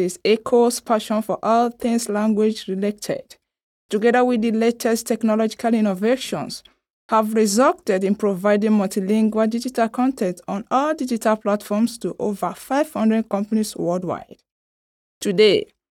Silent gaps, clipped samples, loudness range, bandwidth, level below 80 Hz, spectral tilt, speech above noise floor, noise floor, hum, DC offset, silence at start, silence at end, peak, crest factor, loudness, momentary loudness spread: 3.63-3.89 s, 6.93-7.09 s, 14.52-15.21 s; under 0.1%; 3 LU; 16 kHz; -62 dBFS; -5 dB/octave; over 70 dB; under -90 dBFS; none; under 0.1%; 0 s; 0.25 s; -4 dBFS; 16 dB; -20 LUFS; 9 LU